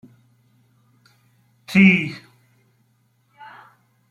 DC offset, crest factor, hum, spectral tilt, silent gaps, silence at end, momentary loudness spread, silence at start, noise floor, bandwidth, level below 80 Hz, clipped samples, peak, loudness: under 0.1%; 20 dB; none; -6.5 dB/octave; none; 1.95 s; 30 LU; 1.7 s; -64 dBFS; 11.5 kHz; -64 dBFS; under 0.1%; -4 dBFS; -16 LUFS